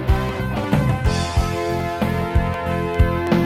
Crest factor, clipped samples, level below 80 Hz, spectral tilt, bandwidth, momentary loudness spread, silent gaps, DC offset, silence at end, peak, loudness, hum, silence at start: 16 dB; under 0.1%; -26 dBFS; -6.5 dB/octave; 15.5 kHz; 4 LU; none; under 0.1%; 0 s; -2 dBFS; -21 LUFS; none; 0 s